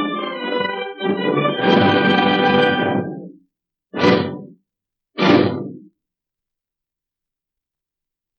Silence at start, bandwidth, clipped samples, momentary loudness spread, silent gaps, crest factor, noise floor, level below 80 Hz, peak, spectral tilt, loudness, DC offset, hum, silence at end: 0 s; 6.8 kHz; under 0.1%; 16 LU; none; 18 dB; -86 dBFS; -66 dBFS; -2 dBFS; -7 dB/octave; -17 LUFS; under 0.1%; none; 2.6 s